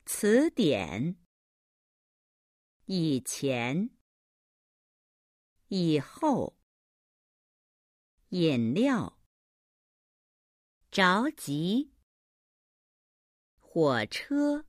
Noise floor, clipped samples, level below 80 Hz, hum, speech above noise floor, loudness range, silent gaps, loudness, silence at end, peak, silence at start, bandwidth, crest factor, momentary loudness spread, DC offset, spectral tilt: under -90 dBFS; under 0.1%; -68 dBFS; none; over 62 dB; 4 LU; 1.26-2.80 s, 4.01-5.56 s, 6.63-8.18 s, 9.26-10.81 s, 12.03-13.57 s; -29 LUFS; 0.05 s; -12 dBFS; 0.05 s; 15.5 kHz; 20 dB; 11 LU; under 0.1%; -5 dB/octave